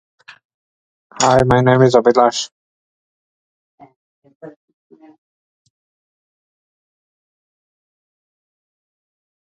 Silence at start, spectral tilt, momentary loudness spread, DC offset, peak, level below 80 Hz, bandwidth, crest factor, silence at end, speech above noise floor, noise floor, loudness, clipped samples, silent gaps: 1.2 s; -5 dB/octave; 10 LU; under 0.1%; 0 dBFS; -48 dBFS; 10 kHz; 20 dB; 5.05 s; over 78 dB; under -90 dBFS; -13 LUFS; under 0.1%; 2.52-3.78 s, 3.96-4.22 s, 4.35-4.40 s